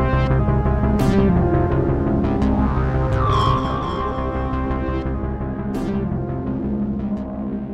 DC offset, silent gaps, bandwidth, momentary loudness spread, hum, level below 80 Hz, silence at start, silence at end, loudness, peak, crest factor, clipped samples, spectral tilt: under 0.1%; none; 9.2 kHz; 8 LU; none; -26 dBFS; 0 s; 0 s; -21 LUFS; -4 dBFS; 14 dB; under 0.1%; -8.5 dB/octave